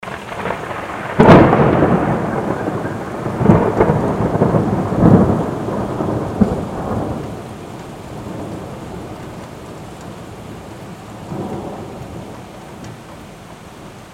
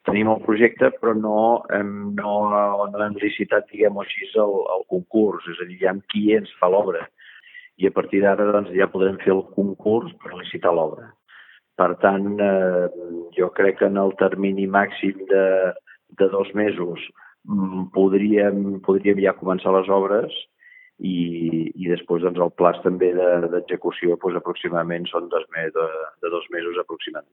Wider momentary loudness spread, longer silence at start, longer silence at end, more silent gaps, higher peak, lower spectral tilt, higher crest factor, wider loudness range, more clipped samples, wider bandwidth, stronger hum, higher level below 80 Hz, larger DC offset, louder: first, 22 LU vs 9 LU; about the same, 0 s vs 0.05 s; about the same, 0 s vs 0.1 s; neither; about the same, 0 dBFS vs 0 dBFS; second, -8 dB/octave vs -11 dB/octave; about the same, 18 dB vs 20 dB; first, 17 LU vs 2 LU; neither; first, 15 kHz vs 4 kHz; neither; first, -36 dBFS vs -66 dBFS; neither; first, -16 LUFS vs -21 LUFS